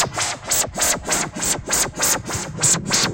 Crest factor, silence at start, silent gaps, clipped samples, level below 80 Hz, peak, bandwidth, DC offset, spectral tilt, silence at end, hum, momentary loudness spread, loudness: 16 dB; 0 s; none; under 0.1%; -42 dBFS; -6 dBFS; 17 kHz; under 0.1%; -1.5 dB/octave; 0 s; none; 5 LU; -19 LUFS